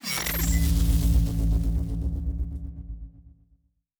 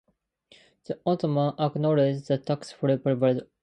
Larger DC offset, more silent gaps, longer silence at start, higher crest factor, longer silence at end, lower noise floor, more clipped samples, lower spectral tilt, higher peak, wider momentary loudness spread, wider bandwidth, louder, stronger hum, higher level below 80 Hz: neither; neither; second, 0.05 s vs 0.9 s; about the same, 14 dB vs 16 dB; first, 0.9 s vs 0.2 s; about the same, -65 dBFS vs -62 dBFS; neither; second, -5 dB/octave vs -8 dB/octave; about the same, -12 dBFS vs -10 dBFS; first, 17 LU vs 7 LU; first, over 20 kHz vs 9.4 kHz; about the same, -26 LUFS vs -26 LUFS; neither; first, -26 dBFS vs -70 dBFS